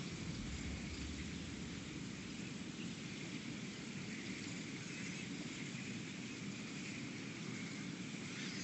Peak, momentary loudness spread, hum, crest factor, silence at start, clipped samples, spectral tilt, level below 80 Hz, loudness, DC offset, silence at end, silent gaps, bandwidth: -32 dBFS; 2 LU; none; 14 dB; 0 s; under 0.1%; -4 dB/octave; -60 dBFS; -46 LUFS; under 0.1%; 0 s; none; 8.4 kHz